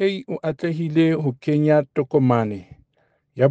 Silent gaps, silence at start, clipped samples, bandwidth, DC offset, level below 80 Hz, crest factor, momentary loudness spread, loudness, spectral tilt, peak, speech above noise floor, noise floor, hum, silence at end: none; 0 s; under 0.1%; 8 kHz; under 0.1%; -62 dBFS; 18 dB; 10 LU; -21 LUFS; -9 dB/octave; -4 dBFS; 46 dB; -66 dBFS; none; 0 s